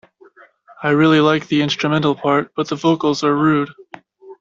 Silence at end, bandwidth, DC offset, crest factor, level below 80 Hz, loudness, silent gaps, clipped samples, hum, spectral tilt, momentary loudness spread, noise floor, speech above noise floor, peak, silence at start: 0.05 s; 7.6 kHz; under 0.1%; 16 dB; -58 dBFS; -16 LUFS; none; under 0.1%; none; -6 dB/octave; 7 LU; -48 dBFS; 32 dB; -2 dBFS; 0.8 s